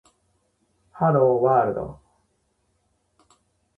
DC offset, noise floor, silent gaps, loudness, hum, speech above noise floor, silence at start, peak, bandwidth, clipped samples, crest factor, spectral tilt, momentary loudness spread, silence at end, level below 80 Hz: under 0.1%; -70 dBFS; none; -21 LUFS; none; 50 dB; 0.95 s; -8 dBFS; 8.2 kHz; under 0.1%; 18 dB; -10.5 dB/octave; 13 LU; 1.85 s; -58 dBFS